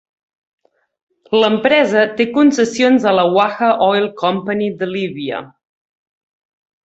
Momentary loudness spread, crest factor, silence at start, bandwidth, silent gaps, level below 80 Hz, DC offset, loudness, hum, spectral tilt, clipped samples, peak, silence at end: 9 LU; 16 dB; 1.3 s; 8.2 kHz; none; -60 dBFS; under 0.1%; -15 LUFS; none; -5 dB/octave; under 0.1%; 0 dBFS; 1.4 s